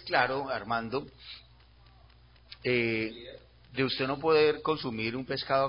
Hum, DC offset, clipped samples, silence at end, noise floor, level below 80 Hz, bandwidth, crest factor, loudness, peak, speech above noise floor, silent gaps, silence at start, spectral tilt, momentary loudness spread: 60 Hz at -60 dBFS; under 0.1%; under 0.1%; 0 s; -58 dBFS; -60 dBFS; 5.4 kHz; 22 dB; -30 LUFS; -10 dBFS; 28 dB; none; 0 s; -9 dB/octave; 22 LU